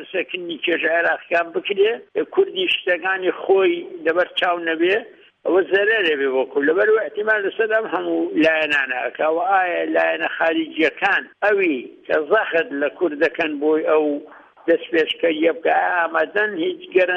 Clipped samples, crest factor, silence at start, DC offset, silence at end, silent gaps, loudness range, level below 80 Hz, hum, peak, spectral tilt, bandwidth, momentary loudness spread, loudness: under 0.1%; 14 dB; 0 s; under 0.1%; 0 s; none; 1 LU; -68 dBFS; none; -4 dBFS; -5 dB/octave; 7.6 kHz; 6 LU; -19 LUFS